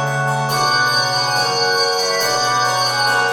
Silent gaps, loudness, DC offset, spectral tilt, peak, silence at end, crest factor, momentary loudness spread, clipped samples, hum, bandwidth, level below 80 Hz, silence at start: none; -15 LUFS; under 0.1%; -2 dB/octave; -4 dBFS; 0 s; 14 dB; 2 LU; under 0.1%; none; 17 kHz; -58 dBFS; 0 s